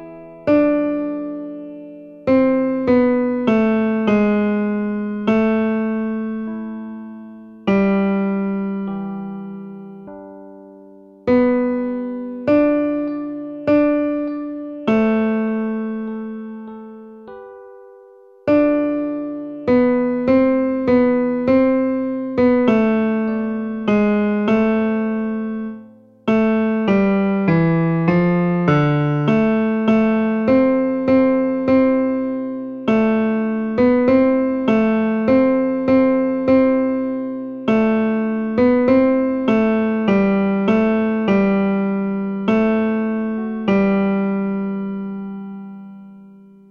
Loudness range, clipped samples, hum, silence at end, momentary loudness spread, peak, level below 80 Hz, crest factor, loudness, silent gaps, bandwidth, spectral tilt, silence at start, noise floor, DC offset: 6 LU; under 0.1%; none; 0.45 s; 14 LU; -4 dBFS; -50 dBFS; 14 dB; -18 LUFS; none; 6.2 kHz; -9.5 dB/octave; 0 s; -45 dBFS; under 0.1%